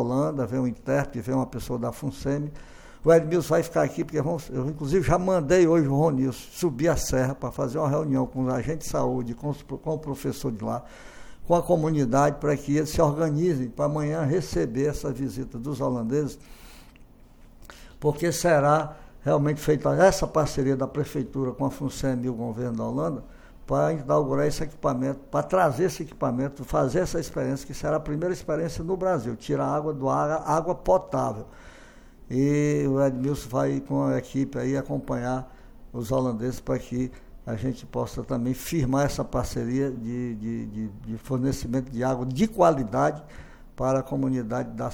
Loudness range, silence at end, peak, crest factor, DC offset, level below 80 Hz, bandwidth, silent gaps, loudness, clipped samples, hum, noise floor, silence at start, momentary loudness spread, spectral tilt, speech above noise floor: 5 LU; 0 s; -6 dBFS; 20 dB; under 0.1%; -44 dBFS; 18.5 kHz; none; -26 LUFS; under 0.1%; none; -50 dBFS; 0 s; 10 LU; -6.5 dB/octave; 25 dB